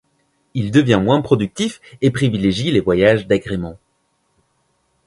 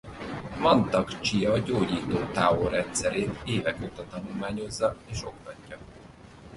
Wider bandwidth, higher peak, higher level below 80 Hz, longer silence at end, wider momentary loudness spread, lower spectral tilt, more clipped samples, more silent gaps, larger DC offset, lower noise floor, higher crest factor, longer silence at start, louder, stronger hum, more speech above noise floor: about the same, 11.5 kHz vs 11.5 kHz; first, 0 dBFS vs -8 dBFS; about the same, -44 dBFS vs -48 dBFS; first, 1.3 s vs 0 s; second, 11 LU vs 16 LU; first, -6.5 dB/octave vs -5 dB/octave; neither; neither; neither; first, -65 dBFS vs -48 dBFS; about the same, 18 dB vs 20 dB; first, 0.55 s vs 0.05 s; first, -17 LUFS vs -27 LUFS; neither; first, 49 dB vs 21 dB